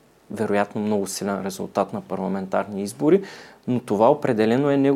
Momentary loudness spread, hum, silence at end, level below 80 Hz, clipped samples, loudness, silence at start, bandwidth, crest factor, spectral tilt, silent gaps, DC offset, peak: 10 LU; none; 0 s; -68 dBFS; under 0.1%; -23 LUFS; 0.3 s; 16 kHz; 18 dB; -6 dB/octave; none; under 0.1%; -4 dBFS